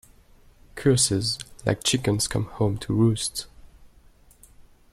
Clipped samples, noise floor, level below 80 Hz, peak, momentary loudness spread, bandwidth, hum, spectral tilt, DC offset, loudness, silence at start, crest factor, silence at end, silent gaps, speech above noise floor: under 0.1%; -54 dBFS; -48 dBFS; -8 dBFS; 9 LU; 15 kHz; none; -4.5 dB/octave; under 0.1%; -24 LUFS; 0.75 s; 18 dB; 0.3 s; none; 31 dB